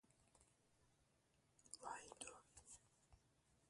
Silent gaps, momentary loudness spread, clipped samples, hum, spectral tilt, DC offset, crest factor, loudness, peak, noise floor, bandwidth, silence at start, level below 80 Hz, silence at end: none; 11 LU; under 0.1%; none; -1.5 dB/octave; under 0.1%; 28 dB; -58 LUFS; -36 dBFS; -81 dBFS; 11.5 kHz; 0.05 s; -82 dBFS; 0 s